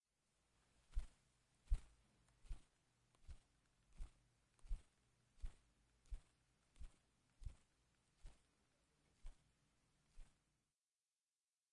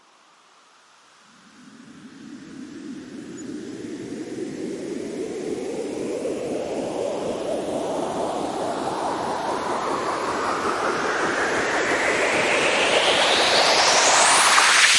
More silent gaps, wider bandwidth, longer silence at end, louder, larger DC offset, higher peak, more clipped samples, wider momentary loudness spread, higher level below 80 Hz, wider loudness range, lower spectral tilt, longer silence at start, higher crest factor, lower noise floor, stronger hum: neither; about the same, 11 kHz vs 11.5 kHz; first, 1.5 s vs 0 s; second, -59 LUFS vs -21 LUFS; neither; second, -28 dBFS vs -2 dBFS; neither; second, 17 LU vs 20 LU; about the same, -56 dBFS vs -60 dBFS; second, 10 LU vs 20 LU; first, -5 dB/octave vs -1 dB/octave; second, 0.9 s vs 1.6 s; first, 26 dB vs 20 dB; first, under -90 dBFS vs -55 dBFS; neither